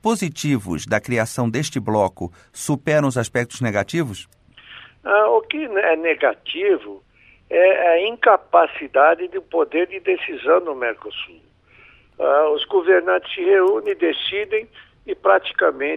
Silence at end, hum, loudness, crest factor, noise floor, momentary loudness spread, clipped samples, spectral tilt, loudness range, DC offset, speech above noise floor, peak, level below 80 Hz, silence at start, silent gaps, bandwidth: 0 s; none; -19 LUFS; 18 dB; -51 dBFS; 10 LU; under 0.1%; -5 dB/octave; 4 LU; under 0.1%; 32 dB; -2 dBFS; -56 dBFS; 0.05 s; none; 14.5 kHz